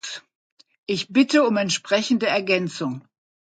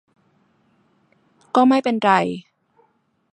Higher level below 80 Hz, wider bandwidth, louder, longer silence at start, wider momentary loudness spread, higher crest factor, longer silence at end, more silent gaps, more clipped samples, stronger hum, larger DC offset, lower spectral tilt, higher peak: about the same, -70 dBFS vs -68 dBFS; about the same, 9.2 kHz vs 9.2 kHz; second, -21 LUFS vs -18 LUFS; second, 0.05 s vs 1.55 s; first, 17 LU vs 11 LU; about the same, 18 dB vs 20 dB; second, 0.6 s vs 0.95 s; first, 0.35-0.57 s, 0.78-0.83 s vs none; neither; neither; neither; second, -4 dB/octave vs -6 dB/octave; about the same, -4 dBFS vs -2 dBFS